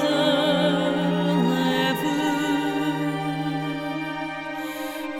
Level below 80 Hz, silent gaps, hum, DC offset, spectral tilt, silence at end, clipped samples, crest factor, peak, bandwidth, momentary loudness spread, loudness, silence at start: -60 dBFS; none; none; under 0.1%; -5.5 dB/octave; 0 s; under 0.1%; 14 dB; -8 dBFS; 17 kHz; 10 LU; -24 LUFS; 0 s